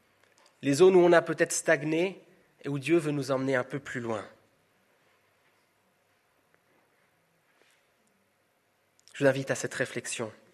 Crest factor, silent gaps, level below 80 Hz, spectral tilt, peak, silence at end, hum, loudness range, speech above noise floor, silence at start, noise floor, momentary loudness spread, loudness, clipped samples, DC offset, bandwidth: 22 dB; none; -76 dBFS; -5 dB/octave; -8 dBFS; 0.25 s; none; 14 LU; 45 dB; 0.6 s; -71 dBFS; 15 LU; -27 LUFS; under 0.1%; under 0.1%; 13.5 kHz